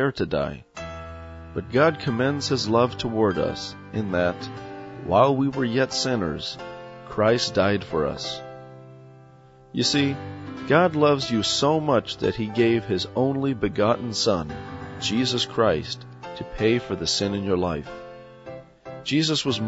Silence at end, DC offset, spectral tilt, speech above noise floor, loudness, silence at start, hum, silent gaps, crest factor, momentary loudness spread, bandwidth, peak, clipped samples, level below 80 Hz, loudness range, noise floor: 0 s; under 0.1%; -5 dB/octave; 27 dB; -23 LUFS; 0 s; none; none; 20 dB; 17 LU; 8 kHz; -4 dBFS; under 0.1%; -50 dBFS; 4 LU; -50 dBFS